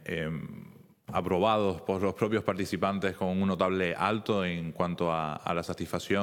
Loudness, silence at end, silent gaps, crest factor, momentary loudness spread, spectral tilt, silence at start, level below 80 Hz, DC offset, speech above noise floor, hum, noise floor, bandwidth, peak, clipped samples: -30 LUFS; 0 s; none; 20 dB; 8 LU; -6.5 dB/octave; 0 s; -64 dBFS; under 0.1%; 22 dB; none; -51 dBFS; 17 kHz; -10 dBFS; under 0.1%